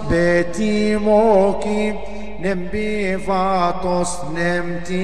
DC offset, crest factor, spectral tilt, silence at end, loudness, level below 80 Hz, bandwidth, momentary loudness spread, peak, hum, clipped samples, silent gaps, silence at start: 5%; 14 dB; -5.5 dB/octave; 0 s; -19 LUFS; -38 dBFS; 11.5 kHz; 9 LU; -4 dBFS; none; under 0.1%; none; 0 s